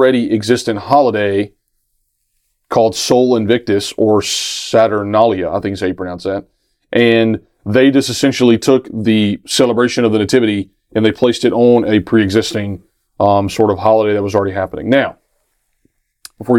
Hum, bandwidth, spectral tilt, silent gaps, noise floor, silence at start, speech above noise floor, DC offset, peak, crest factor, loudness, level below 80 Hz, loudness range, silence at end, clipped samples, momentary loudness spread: none; 16.5 kHz; -5 dB/octave; none; -65 dBFS; 0 s; 53 dB; under 0.1%; 0 dBFS; 14 dB; -14 LUFS; -48 dBFS; 3 LU; 0 s; under 0.1%; 9 LU